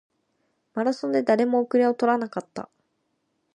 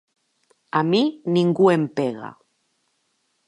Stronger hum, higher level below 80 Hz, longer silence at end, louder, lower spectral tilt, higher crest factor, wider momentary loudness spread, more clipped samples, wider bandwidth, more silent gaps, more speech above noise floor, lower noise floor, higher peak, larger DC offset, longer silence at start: neither; about the same, -78 dBFS vs -74 dBFS; second, 0.9 s vs 1.15 s; second, -23 LUFS vs -20 LUFS; about the same, -6 dB/octave vs -7 dB/octave; about the same, 18 dB vs 18 dB; about the same, 14 LU vs 12 LU; neither; about the same, 10 kHz vs 10.5 kHz; neither; about the same, 51 dB vs 50 dB; first, -74 dBFS vs -70 dBFS; second, -8 dBFS vs -4 dBFS; neither; about the same, 0.75 s vs 0.75 s